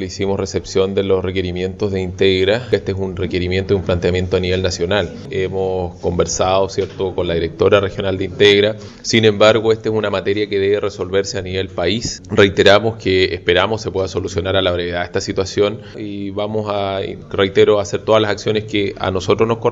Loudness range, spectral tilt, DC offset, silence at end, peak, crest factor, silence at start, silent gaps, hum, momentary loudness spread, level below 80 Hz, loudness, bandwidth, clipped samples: 4 LU; -5 dB/octave; under 0.1%; 0 s; 0 dBFS; 16 dB; 0 s; none; none; 9 LU; -42 dBFS; -17 LUFS; 8 kHz; under 0.1%